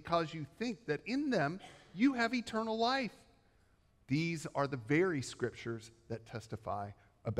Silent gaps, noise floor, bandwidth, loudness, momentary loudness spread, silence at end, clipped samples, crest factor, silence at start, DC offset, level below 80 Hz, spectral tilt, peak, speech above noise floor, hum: none; -70 dBFS; 12.5 kHz; -36 LUFS; 14 LU; 0 s; under 0.1%; 18 dB; 0 s; under 0.1%; -68 dBFS; -5.5 dB/octave; -18 dBFS; 34 dB; none